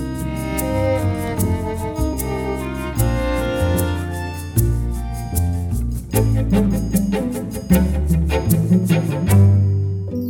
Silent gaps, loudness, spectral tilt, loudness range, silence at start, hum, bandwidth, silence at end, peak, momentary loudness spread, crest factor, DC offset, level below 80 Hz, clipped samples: none; -19 LUFS; -7 dB/octave; 4 LU; 0 s; none; 17.5 kHz; 0 s; -2 dBFS; 8 LU; 16 dB; under 0.1%; -26 dBFS; under 0.1%